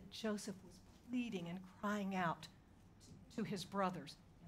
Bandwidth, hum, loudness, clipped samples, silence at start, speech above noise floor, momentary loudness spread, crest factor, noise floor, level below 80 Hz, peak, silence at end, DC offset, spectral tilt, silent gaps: 16 kHz; none; -44 LUFS; under 0.1%; 0 s; 21 dB; 21 LU; 18 dB; -64 dBFS; -72 dBFS; -26 dBFS; 0 s; under 0.1%; -5.5 dB/octave; none